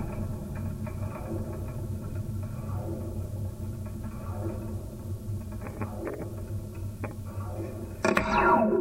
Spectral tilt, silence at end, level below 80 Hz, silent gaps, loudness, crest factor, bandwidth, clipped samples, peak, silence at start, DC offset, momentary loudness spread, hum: -7 dB/octave; 0 s; -44 dBFS; none; -32 LUFS; 26 dB; 16 kHz; under 0.1%; -4 dBFS; 0 s; under 0.1%; 13 LU; none